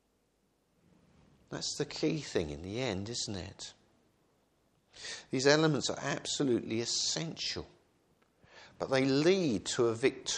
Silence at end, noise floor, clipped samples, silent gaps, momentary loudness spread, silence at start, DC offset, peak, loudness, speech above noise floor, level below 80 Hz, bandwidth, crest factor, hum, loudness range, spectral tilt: 0 s; -75 dBFS; under 0.1%; none; 15 LU; 1.5 s; under 0.1%; -10 dBFS; -32 LUFS; 42 dB; -64 dBFS; 10.5 kHz; 24 dB; none; 6 LU; -4 dB/octave